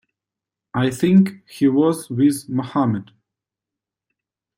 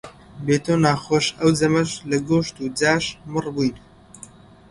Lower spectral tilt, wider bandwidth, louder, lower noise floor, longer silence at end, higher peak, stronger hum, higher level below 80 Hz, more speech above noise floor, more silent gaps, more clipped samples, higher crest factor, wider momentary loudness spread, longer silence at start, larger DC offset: first, -7 dB/octave vs -5 dB/octave; first, 16 kHz vs 11.5 kHz; about the same, -19 LUFS vs -21 LUFS; first, -87 dBFS vs -45 dBFS; first, 1.55 s vs 0.55 s; about the same, -4 dBFS vs -2 dBFS; neither; second, -60 dBFS vs -52 dBFS; first, 69 dB vs 25 dB; neither; neither; about the same, 16 dB vs 20 dB; about the same, 9 LU vs 8 LU; first, 0.75 s vs 0.05 s; neither